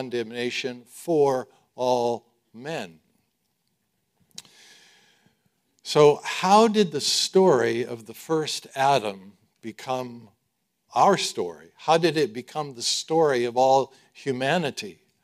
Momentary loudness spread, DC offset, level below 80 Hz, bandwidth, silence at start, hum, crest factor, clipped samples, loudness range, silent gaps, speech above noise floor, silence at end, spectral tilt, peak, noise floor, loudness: 19 LU; under 0.1%; -74 dBFS; 15.5 kHz; 0 s; none; 20 dB; under 0.1%; 11 LU; none; 53 dB; 0.3 s; -4 dB/octave; -4 dBFS; -76 dBFS; -23 LUFS